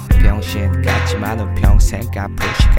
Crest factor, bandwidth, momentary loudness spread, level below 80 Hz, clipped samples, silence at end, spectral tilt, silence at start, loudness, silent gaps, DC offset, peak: 12 dB; 16.5 kHz; 6 LU; -16 dBFS; under 0.1%; 0 s; -5.5 dB/octave; 0 s; -17 LUFS; none; under 0.1%; 0 dBFS